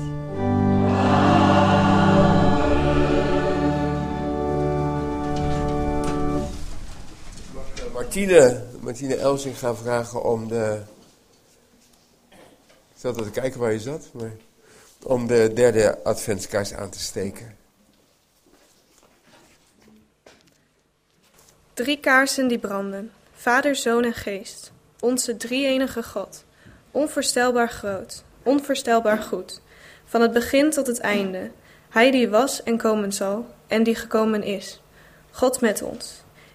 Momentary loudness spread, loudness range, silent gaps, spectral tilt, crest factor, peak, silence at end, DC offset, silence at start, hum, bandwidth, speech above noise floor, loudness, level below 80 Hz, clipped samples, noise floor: 19 LU; 11 LU; none; -5 dB/octave; 22 dB; 0 dBFS; 0.35 s; under 0.1%; 0 s; none; 15.5 kHz; 43 dB; -22 LUFS; -38 dBFS; under 0.1%; -65 dBFS